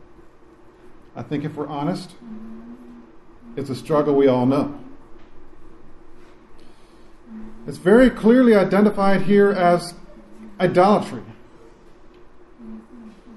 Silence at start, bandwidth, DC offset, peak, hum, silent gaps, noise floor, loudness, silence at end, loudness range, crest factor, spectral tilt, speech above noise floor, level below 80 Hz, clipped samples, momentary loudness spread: 0.9 s; 12.5 kHz; under 0.1%; -2 dBFS; none; none; -47 dBFS; -18 LUFS; 0.25 s; 14 LU; 18 dB; -7.5 dB/octave; 30 dB; -48 dBFS; under 0.1%; 26 LU